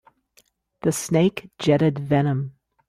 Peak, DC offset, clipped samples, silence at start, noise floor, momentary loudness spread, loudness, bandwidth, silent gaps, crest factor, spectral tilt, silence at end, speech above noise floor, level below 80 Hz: -6 dBFS; under 0.1%; under 0.1%; 0.85 s; -62 dBFS; 8 LU; -22 LUFS; 15.5 kHz; none; 18 dB; -6 dB/octave; 0.4 s; 41 dB; -58 dBFS